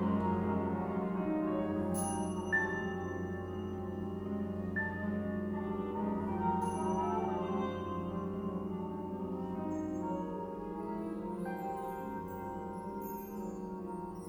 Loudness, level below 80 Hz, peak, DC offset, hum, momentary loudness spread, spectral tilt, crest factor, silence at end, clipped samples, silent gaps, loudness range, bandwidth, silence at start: -37 LUFS; -60 dBFS; -20 dBFS; under 0.1%; none; 8 LU; -7 dB/octave; 16 dB; 0 s; under 0.1%; none; 5 LU; 16.5 kHz; 0 s